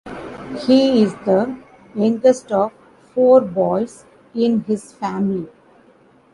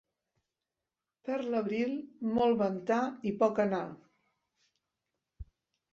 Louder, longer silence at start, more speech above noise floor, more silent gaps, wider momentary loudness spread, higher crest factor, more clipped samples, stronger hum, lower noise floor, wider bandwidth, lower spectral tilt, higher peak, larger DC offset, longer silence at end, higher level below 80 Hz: first, -18 LUFS vs -32 LUFS; second, 0.05 s vs 1.25 s; second, 35 dB vs over 59 dB; neither; first, 17 LU vs 9 LU; about the same, 16 dB vs 20 dB; neither; neither; second, -51 dBFS vs under -90 dBFS; first, 11.5 kHz vs 7.4 kHz; about the same, -6.5 dB/octave vs -7 dB/octave; first, -2 dBFS vs -14 dBFS; neither; first, 0.85 s vs 0.5 s; first, -56 dBFS vs -62 dBFS